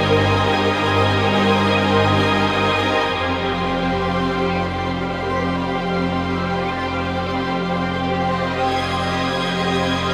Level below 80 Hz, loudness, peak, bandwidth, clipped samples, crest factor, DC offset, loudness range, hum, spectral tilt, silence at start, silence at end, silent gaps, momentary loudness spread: -42 dBFS; -19 LUFS; -4 dBFS; 13 kHz; under 0.1%; 16 dB; under 0.1%; 5 LU; none; -6 dB/octave; 0 s; 0 s; none; 6 LU